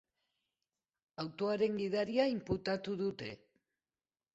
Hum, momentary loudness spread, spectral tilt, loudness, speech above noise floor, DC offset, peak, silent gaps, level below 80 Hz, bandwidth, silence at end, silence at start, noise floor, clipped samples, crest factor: none; 14 LU; -4.5 dB/octave; -36 LUFS; over 54 dB; under 0.1%; -18 dBFS; none; -66 dBFS; 8 kHz; 1 s; 1.2 s; under -90 dBFS; under 0.1%; 20 dB